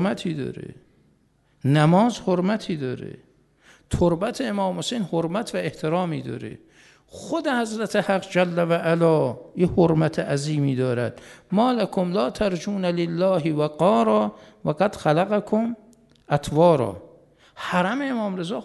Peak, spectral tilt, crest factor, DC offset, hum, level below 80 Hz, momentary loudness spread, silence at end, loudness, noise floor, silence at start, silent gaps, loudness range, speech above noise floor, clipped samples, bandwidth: -4 dBFS; -6.5 dB/octave; 18 dB; under 0.1%; none; -50 dBFS; 12 LU; 0 s; -23 LUFS; -62 dBFS; 0 s; none; 4 LU; 40 dB; under 0.1%; 12.5 kHz